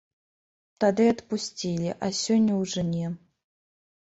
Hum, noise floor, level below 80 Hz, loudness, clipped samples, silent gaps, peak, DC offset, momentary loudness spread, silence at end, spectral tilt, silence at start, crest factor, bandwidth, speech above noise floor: none; under -90 dBFS; -60 dBFS; -26 LUFS; under 0.1%; none; -10 dBFS; under 0.1%; 9 LU; 0.9 s; -5.5 dB/octave; 0.8 s; 18 dB; 8 kHz; over 65 dB